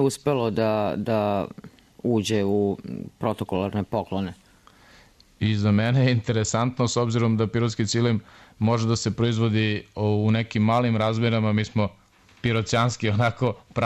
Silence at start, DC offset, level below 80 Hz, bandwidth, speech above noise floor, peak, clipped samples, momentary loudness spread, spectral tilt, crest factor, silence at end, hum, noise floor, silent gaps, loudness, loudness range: 0 s; under 0.1%; -54 dBFS; 13 kHz; 31 dB; -10 dBFS; under 0.1%; 7 LU; -6 dB/octave; 14 dB; 0 s; none; -54 dBFS; none; -24 LUFS; 4 LU